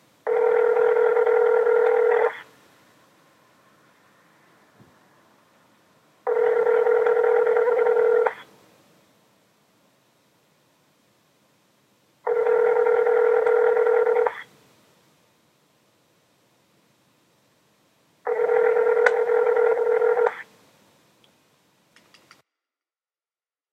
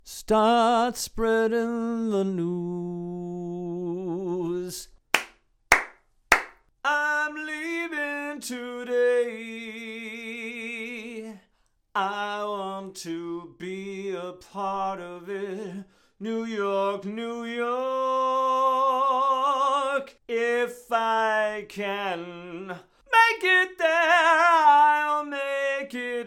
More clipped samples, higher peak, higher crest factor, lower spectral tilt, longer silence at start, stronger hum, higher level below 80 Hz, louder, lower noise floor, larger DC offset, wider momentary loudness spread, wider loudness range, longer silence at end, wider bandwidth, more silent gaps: neither; first, 0 dBFS vs -6 dBFS; about the same, 24 dB vs 20 dB; about the same, -4 dB/octave vs -4 dB/octave; first, 0.25 s vs 0.05 s; neither; second, -82 dBFS vs -56 dBFS; first, -20 LUFS vs -25 LUFS; first, under -90 dBFS vs -68 dBFS; neither; second, 8 LU vs 16 LU; second, 9 LU vs 12 LU; first, 3.3 s vs 0 s; second, 6 kHz vs 16.5 kHz; neither